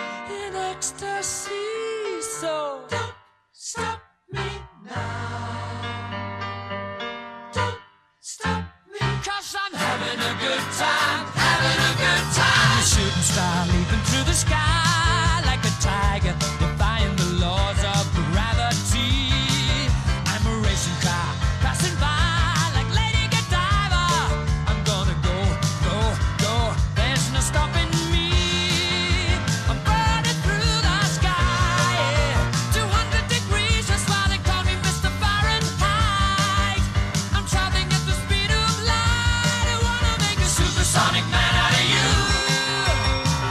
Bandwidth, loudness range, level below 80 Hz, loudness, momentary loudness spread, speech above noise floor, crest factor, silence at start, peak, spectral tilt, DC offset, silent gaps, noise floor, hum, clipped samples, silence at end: 14.5 kHz; 11 LU; -30 dBFS; -21 LUFS; 11 LU; 23 dB; 18 dB; 0 s; -4 dBFS; -3.5 dB/octave; under 0.1%; none; -49 dBFS; none; under 0.1%; 0 s